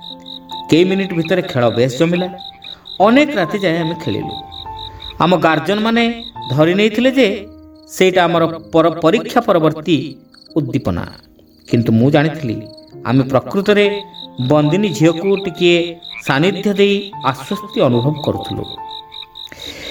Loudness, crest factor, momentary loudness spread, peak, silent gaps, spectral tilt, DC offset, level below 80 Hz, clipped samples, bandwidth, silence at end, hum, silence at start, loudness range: -15 LUFS; 16 dB; 16 LU; 0 dBFS; none; -6 dB/octave; under 0.1%; -48 dBFS; under 0.1%; 19.5 kHz; 0 s; none; 0 s; 3 LU